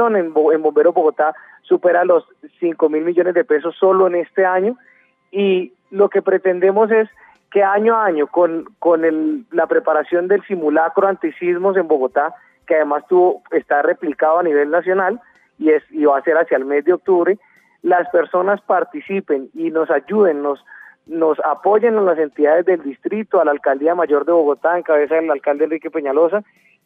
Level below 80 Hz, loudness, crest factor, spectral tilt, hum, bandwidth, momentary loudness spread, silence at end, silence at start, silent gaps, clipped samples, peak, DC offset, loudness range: -74 dBFS; -16 LUFS; 14 dB; -9 dB/octave; none; 3.8 kHz; 7 LU; 0.45 s; 0 s; none; under 0.1%; -2 dBFS; under 0.1%; 2 LU